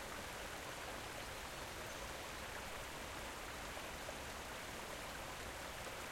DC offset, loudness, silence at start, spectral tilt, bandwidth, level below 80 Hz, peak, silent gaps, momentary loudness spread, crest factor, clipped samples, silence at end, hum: under 0.1%; -47 LUFS; 0 s; -2.5 dB/octave; 16.5 kHz; -60 dBFS; -32 dBFS; none; 0 LU; 16 dB; under 0.1%; 0 s; none